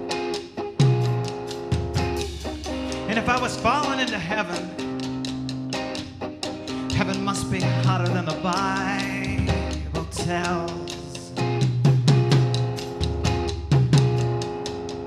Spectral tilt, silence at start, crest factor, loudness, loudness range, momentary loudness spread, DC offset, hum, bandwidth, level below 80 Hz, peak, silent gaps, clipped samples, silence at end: -6 dB/octave; 0 s; 18 dB; -24 LUFS; 5 LU; 11 LU; under 0.1%; none; 12.5 kHz; -38 dBFS; -6 dBFS; none; under 0.1%; 0 s